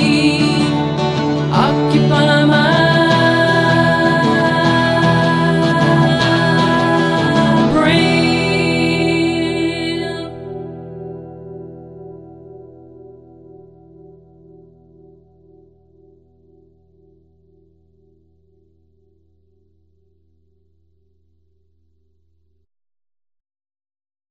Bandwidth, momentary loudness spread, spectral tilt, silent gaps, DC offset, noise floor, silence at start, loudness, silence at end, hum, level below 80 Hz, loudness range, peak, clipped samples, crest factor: 11.5 kHz; 19 LU; -6 dB/octave; none; under 0.1%; -63 dBFS; 0 s; -14 LUFS; 11.25 s; 50 Hz at -50 dBFS; -46 dBFS; 19 LU; -2 dBFS; under 0.1%; 16 dB